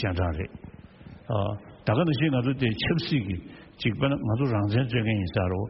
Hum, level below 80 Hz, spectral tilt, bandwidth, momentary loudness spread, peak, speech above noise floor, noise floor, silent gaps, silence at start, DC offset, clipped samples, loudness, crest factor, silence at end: none; -46 dBFS; -6 dB/octave; 5.8 kHz; 12 LU; -10 dBFS; 21 dB; -47 dBFS; none; 0 s; under 0.1%; under 0.1%; -27 LUFS; 16 dB; 0 s